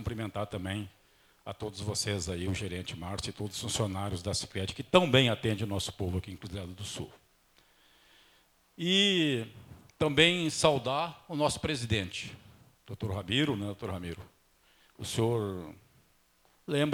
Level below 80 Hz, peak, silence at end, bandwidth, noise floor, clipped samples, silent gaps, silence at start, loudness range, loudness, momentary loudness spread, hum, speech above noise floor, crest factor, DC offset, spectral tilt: -56 dBFS; -6 dBFS; 0 s; 20 kHz; -67 dBFS; under 0.1%; none; 0 s; 8 LU; -31 LUFS; 17 LU; none; 36 dB; 26 dB; under 0.1%; -4.5 dB/octave